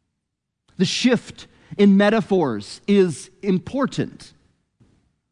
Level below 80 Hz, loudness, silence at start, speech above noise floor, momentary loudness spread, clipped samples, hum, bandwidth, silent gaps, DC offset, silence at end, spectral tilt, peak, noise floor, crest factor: -58 dBFS; -20 LUFS; 0.8 s; 60 dB; 13 LU; under 0.1%; none; 10.5 kHz; none; under 0.1%; 1.1 s; -6 dB/octave; -4 dBFS; -79 dBFS; 16 dB